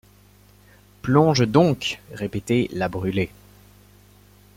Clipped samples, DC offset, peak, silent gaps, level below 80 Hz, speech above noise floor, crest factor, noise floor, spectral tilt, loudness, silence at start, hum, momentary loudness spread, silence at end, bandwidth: under 0.1%; under 0.1%; -4 dBFS; none; -52 dBFS; 32 dB; 20 dB; -52 dBFS; -6.5 dB/octave; -22 LUFS; 1.05 s; 50 Hz at -45 dBFS; 13 LU; 1.3 s; 16.5 kHz